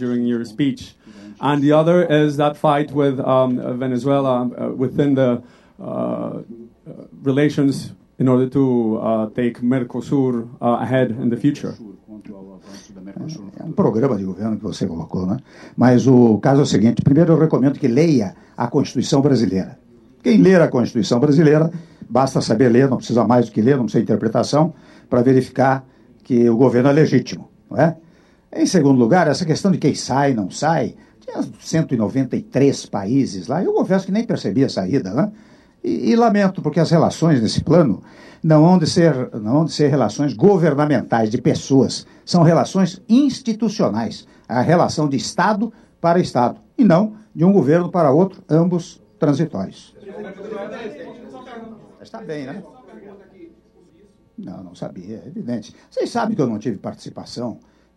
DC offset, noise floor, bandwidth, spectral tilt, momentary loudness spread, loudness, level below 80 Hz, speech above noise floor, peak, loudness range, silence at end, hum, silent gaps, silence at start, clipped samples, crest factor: under 0.1%; -53 dBFS; 11.5 kHz; -7 dB/octave; 17 LU; -17 LUFS; -56 dBFS; 36 dB; -2 dBFS; 10 LU; 0.4 s; none; none; 0 s; under 0.1%; 16 dB